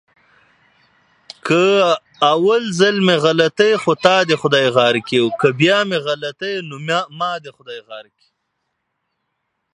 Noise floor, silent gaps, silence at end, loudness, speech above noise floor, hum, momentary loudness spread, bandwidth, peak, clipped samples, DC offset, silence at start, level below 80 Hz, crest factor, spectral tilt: -73 dBFS; none; 1.7 s; -16 LUFS; 57 dB; none; 16 LU; 11 kHz; 0 dBFS; under 0.1%; under 0.1%; 1.45 s; -66 dBFS; 18 dB; -5 dB/octave